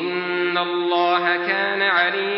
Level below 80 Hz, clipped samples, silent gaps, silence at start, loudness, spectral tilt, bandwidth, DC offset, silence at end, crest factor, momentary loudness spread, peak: -78 dBFS; under 0.1%; none; 0 s; -19 LUFS; -8.5 dB/octave; 5.8 kHz; under 0.1%; 0 s; 16 dB; 4 LU; -4 dBFS